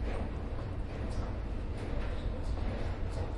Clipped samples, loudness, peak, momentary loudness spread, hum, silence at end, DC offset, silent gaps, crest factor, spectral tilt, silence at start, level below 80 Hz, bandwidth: under 0.1%; -39 LUFS; -22 dBFS; 2 LU; none; 0 s; under 0.1%; none; 12 dB; -7.5 dB/octave; 0 s; -38 dBFS; 11 kHz